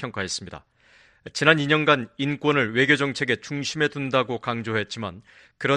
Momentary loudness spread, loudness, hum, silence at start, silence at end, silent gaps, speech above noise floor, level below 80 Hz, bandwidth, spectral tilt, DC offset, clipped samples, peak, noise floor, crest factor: 12 LU; -23 LUFS; none; 0 s; 0 s; none; 33 dB; -62 dBFS; 11 kHz; -4.5 dB/octave; under 0.1%; under 0.1%; 0 dBFS; -57 dBFS; 24 dB